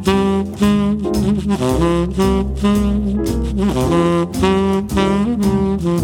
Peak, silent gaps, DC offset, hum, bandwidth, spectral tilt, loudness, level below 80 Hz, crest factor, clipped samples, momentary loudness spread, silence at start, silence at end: -2 dBFS; none; under 0.1%; none; 16.5 kHz; -7 dB/octave; -16 LUFS; -26 dBFS; 14 dB; under 0.1%; 3 LU; 0 s; 0 s